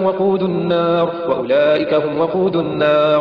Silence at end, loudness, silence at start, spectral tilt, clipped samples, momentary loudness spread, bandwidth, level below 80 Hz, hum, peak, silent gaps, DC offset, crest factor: 0 s; -16 LUFS; 0 s; -8.5 dB/octave; under 0.1%; 4 LU; 5.6 kHz; -56 dBFS; none; -4 dBFS; none; 0.1%; 10 dB